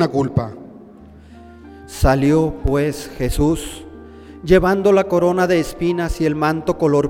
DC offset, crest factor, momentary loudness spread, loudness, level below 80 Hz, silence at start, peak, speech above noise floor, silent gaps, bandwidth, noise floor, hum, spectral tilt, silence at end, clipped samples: under 0.1%; 16 dB; 17 LU; -17 LUFS; -30 dBFS; 0 s; -2 dBFS; 25 dB; none; 17 kHz; -41 dBFS; none; -6.5 dB/octave; 0 s; under 0.1%